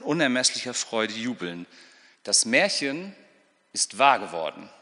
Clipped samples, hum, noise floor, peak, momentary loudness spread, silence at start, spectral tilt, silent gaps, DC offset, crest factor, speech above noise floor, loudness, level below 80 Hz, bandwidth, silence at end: under 0.1%; none; -61 dBFS; -4 dBFS; 16 LU; 0 s; -1.5 dB/octave; none; under 0.1%; 22 dB; 36 dB; -24 LUFS; -78 dBFS; 10.5 kHz; 0.15 s